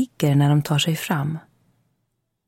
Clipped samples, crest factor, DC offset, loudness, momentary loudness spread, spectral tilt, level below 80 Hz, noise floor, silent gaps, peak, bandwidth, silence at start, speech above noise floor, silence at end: under 0.1%; 14 dB; under 0.1%; -21 LUFS; 10 LU; -5.5 dB/octave; -62 dBFS; -74 dBFS; none; -8 dBFS; 16.5 kHz; 0 s; 54 dB; 1.1 s